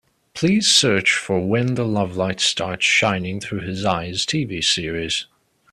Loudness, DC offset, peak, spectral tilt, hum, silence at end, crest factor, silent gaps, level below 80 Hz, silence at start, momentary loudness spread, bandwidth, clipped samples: -19 LUFS; under 0.1%; -2 dBFS; -3.5 dB/octave; none; 0.5 s; 18 dB; none; -52 dBFS; 0.35 s; 11 LU; 14.5 kHz; under 0.1%